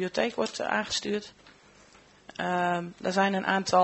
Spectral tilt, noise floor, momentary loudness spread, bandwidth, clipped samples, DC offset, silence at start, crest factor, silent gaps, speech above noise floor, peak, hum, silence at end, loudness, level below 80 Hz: -4 dB/octave; -57 dBFS; 9 LU; 8.2 kHz; under 0.1%; under 0.1%; 0 s; 20 dB; none; 29 dB; -8 dBFS; none; 0 s; -28 LUFS; -66 dBFS